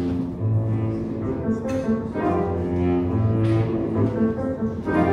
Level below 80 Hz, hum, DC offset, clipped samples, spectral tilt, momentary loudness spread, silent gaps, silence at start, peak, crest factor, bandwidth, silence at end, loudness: -44 dBFS; none; under 0.1%; under 0.1%; -9.5 dB/octave; 5 LU; none; 0 s; -8 dBFS; 14 dB; 7 kHz; 0 s; -23 LUFS